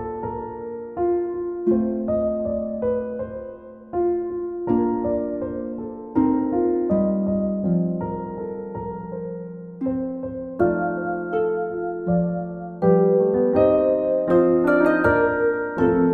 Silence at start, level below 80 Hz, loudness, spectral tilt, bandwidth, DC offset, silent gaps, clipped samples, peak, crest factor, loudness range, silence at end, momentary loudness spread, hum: 0 s; -48 dBFS; -22 LUFS; -11 dB/octave; 4.5 kHz; under 0.1%; none; under 0.1%; -4 dBFS; 18 dB; 8 LU; 0 s; 14 LU; none